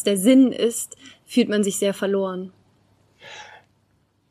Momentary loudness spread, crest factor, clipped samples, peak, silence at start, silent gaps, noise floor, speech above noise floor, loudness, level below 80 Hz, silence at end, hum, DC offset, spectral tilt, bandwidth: 24 LU; 18 dB; under 0.1%; -4 dBFS; 0 s; none; -65 dBFS; 44 dB; -20 LUFS; -72 dBFS; 0.85 s; none; under 0.1%; -4.5 dB/octave; 15.5 kHz